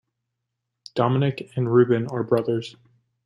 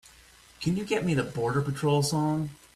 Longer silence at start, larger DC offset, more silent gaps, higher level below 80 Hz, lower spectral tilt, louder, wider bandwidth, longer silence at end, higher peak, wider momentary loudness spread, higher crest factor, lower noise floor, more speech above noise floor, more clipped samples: first, 0.95 s vs 0.6 s; neither; neither; second, -64 dBFS vs -56 dBFS; first, -8.5 dB/octave vs -6 dB/octave; first, -23 LUFS vs -28 LUFS; second, 10.5 kHz vs 14 kHz; first, 0.55 s vs 0.2 s; first, -4 dBFS vs -14 dBFS; first, 10 LU vs 6 LU; about the same, 18 dB vs 14 dB; first, -81 dBFS vs -55 dBFS; first, 59 dB vs 28 dB; neither